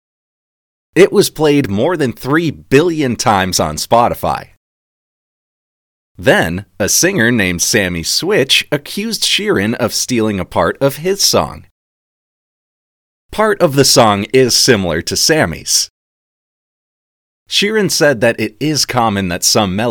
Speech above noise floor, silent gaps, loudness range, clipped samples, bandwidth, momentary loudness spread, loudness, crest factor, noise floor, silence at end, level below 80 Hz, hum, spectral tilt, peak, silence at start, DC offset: over 77 dB; 4.57-6.15 s, 11.71-13.29 s, 15.90-17.46 s; 5 LU; 0.2%; 19.5 kHz; 7 LU; -13 LUFS; 14 dB; under -90 dBFS; 0 s; -42 dBFS; none; -3.5 dB/octave; 0 dBFS; 0.95 s; under 0.1%